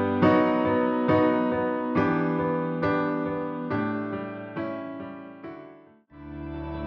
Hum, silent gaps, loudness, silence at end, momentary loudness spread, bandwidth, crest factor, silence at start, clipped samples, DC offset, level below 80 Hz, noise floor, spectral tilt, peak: none; none; -26 LUFS; 0 s; 18 LU; 5.8 kHz; 18 dB; 0 s; under 0.1%; under 0.1%; -52 dBFS; -51 dBFS; -9.5 dB/octave; -8 dBFS